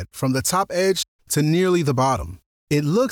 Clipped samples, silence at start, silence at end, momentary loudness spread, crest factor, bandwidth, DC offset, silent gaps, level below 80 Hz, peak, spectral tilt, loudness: under 0.1%; 0 s; 0 s; 6 LU; 12 dB; 19.5 kHz; under 0.1%; 1.08-1.19 s, 2.46-2.67 s; -46 dBFS; -8 dBFS; -5 dB/octave; -21 LUFS